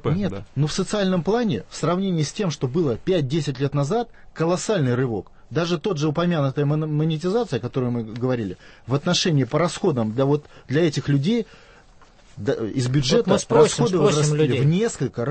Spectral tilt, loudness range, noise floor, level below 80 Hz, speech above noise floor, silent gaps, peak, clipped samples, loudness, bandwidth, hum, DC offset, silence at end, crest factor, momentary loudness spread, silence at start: -6 dB/octave; 3 LU; -50 dBFS; -48 dBFS; 28 dB; none; -4 dBFS; under 0.1%; -22 LUFS; 8.8 kHz; none; under 0.1%; 0 s; 18 dB; 7 LU; 0 s